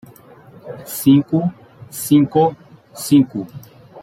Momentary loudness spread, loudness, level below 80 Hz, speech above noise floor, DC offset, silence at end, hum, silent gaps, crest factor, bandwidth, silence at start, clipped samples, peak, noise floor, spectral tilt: 20 LU; -16 LUFS; -56 dBFS; 28 dB; under 0.1%; 0 s; none; none; 16 dB; 16.5 kHz; 0.65 s; under 0.1%; -2 dBFS; -44 dBFS; -6.5 dB/octave